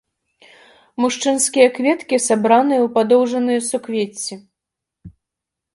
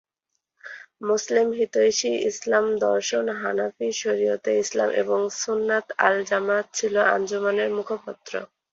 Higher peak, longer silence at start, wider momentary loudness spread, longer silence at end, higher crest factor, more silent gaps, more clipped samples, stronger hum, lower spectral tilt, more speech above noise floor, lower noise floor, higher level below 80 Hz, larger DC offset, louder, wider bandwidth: about the same, 0 dBFS vs -2 dBFS; first, 1 s vs 0.65 s; about the same, 10 LU vs 12 LU; first, 0.65 s vs 0.3 s; about the same, 18 dB vs 20 dB; neither; neither; neither; about the same, -3 dB/octave vs -2.5 dB/octave; first, 67 dB vs 57 dB; about the same, -83 dBFS vs -80 dBFS; first, -62 dBFS vs -72 dBFS; neither; first, -17 LUFS vs -23 LUFS; first, 11.5 kHz vs 7.8 kHz